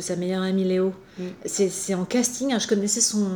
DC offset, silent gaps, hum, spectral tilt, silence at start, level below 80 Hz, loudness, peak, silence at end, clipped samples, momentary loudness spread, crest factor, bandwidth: under 0.1%; none; none; -4 dB/octave; 0 s; -64 dBFS; -24 LUFS; -8 dBFS; 0 s; under 0.1%; 9 LU; 16 dB; over 20 kHz